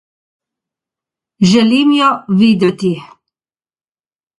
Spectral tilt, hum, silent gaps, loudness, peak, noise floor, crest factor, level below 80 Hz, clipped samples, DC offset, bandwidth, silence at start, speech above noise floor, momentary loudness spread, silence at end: -6 dB/octave; none; none; -12 LUFS; 0 dBFS; under -90 dBFS; 14 dB; -56 dBFS; under 0.1%; under 0.1%; 11.5 kHz; 1.4 s; over 79 dB; 9 LU; 1.35 s